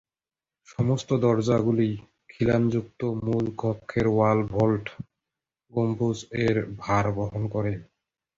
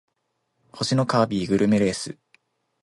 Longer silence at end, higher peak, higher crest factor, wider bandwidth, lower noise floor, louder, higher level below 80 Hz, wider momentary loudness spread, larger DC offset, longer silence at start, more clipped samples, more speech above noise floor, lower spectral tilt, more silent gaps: second, 0.55 s vs 0.7 s; about the same, -8 dBFS vs -6 dBFS; about the same, 18 dB vs 18 dB; second, 7.8 kHz vs 11.5 kHz; first, under -90 dBFS vs -75 dBFS; second, -26 LUFS vs -22 LUFS; first, -50 dBFS vs -56 dBFS; about the same, 9 LU vs 10 LU; neither; about the same, 0.7 s vs 0.75 s; neither; first, over 65 dB vs 53 dB; first, -7.5 dB/octave vs -5.5 dB/octave; neither